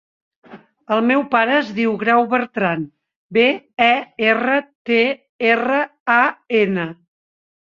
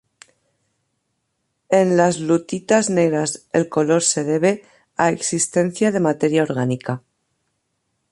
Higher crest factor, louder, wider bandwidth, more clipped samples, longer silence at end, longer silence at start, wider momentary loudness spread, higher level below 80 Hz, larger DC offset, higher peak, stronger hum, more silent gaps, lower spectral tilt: about the same, 18 dB vs 18 dB; about the same, -17 LUFS vs -19 LUFS; second, 7.2 kHz vs 11.5 kHz; neither; second, 0.85 s vs 1.15 s; second, 0.5 s vs 1.7 s; about the same, 6 LU vs 6 LU; about the same, -64 dBFS vs -64 dBFS; neither; about the same, -2 dBFS vs -2 dBFS; neither; first, 3.16-3.29 s, 4.75-4.85 s, 5.29-5.39 s, 6.00-6.06 s vs none; first, -6.5 dB/octave vs -4.5 dB/octave